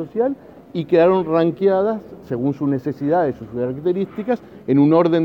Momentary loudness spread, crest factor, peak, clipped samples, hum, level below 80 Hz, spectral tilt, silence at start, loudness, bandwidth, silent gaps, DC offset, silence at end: 11 LU; 16 dB; -4 dBFS; under 0.1%; none; -56 dBFS; -9.5 dB/octave; 0 s; -19 LUFS; 6 kHz; none; under 0.1%; 0 s